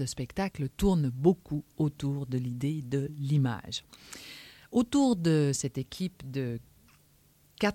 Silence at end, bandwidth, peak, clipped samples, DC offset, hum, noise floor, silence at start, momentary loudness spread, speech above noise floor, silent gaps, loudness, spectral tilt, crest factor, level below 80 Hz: 0 s; 16.5 kHz; -12 dBFS; under 0.1%; under 0.1%; none; -63 dBFS; 0 s; 14 LU; 34 dB; none; -30 LUFS; -6 dB/octave; 20 dB; -50 dBFS